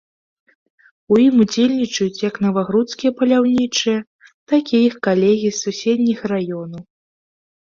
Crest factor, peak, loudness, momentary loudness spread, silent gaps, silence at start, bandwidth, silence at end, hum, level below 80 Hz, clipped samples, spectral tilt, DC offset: 14 dB; -4 dBFS; -17 LUFS; 8 LU; 4.07-4.19 s, 4.34-4.47 s; 1.1 s; 7.4 kHz; 0.8 s; none; -60 dBFS; under 0.1%; -5 dB/octave; under 0.1%